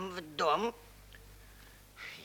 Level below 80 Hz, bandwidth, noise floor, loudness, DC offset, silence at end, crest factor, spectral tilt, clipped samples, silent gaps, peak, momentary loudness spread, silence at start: -60 dBFS; over 20 kHz; -56 dBFS; -34 LUFS; under 0.1%; 0 s; 22 dB; -4 dB/octave; under 0.1%; none; -16 dBFS; 25 LU; 0 s